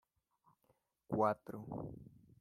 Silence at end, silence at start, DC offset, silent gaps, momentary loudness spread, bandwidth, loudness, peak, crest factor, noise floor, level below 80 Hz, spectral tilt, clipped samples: 0.3 s; 1.1 s; under 0.1%; none; 15 LU; 14.5 kHz; -40 LUFS; -20 dBFS; 24 dB; -79 dBFS; -70 dBFS; -9 dB/octave; under 0.1%